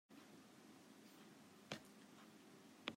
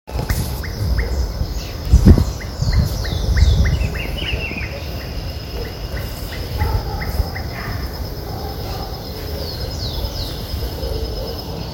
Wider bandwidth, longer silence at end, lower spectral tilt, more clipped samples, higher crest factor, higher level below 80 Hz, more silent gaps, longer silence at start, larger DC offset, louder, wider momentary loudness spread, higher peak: about the same, 16 kHz vs 17 kHz; about the same, 0 s vs 0 s; second, -3.5 dB/octave vs -6 dB/octave; second, under 0.1% vs 0.1%; first, 34 dB vs 20 dB; second, under -90 dBFS vs -22 dBFS; neither; about the same, 0.1 s vs 0.05 s; neither; second, -60 LUFS vs -22 LUFS; second, 9 LU vs 12 LU; second, -26 dBFS vs 0 dBFS